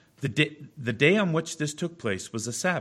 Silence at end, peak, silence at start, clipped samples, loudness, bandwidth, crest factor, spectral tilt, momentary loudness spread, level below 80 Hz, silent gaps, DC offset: 0 s; -6 dBFS; 0.2 s; under 0.1%; -27 LUFS; 14 kHz; 22 dB; -4.5 dB/octave; 10 LU; -66 dBFS; none; under 0.1%